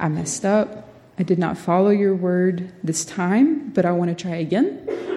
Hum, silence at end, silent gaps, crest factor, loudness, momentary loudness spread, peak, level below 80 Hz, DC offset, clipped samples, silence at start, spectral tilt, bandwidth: none; 0 s; none; 16 dB; -21 LUFS; 10 LU; -6 dBFS; -60 dBFS; under 0.1%; under 0.1%; 0 s; -6 dB/octave; 12.5 kHz